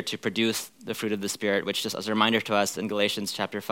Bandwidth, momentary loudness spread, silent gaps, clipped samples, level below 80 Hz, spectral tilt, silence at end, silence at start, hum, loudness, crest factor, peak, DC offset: 17 kHz; 8 LU; none; under 0.1%; -78 dBFS; -3 dB/octave; 0 s; 0 s; none; -27 LUFS; 22 dB; -6 dBFS; under 0.1%